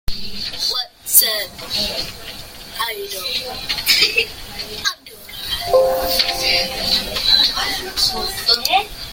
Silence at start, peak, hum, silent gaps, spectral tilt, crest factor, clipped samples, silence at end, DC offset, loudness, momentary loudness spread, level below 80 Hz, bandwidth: 0.05 s; 0 dBFS; none; none; -0.5 dB/octave; 20 dB; under 0.1%; 0 s; under 0.1%; -17 LUFS; 16 LU; -38 dBFS; 17 kHz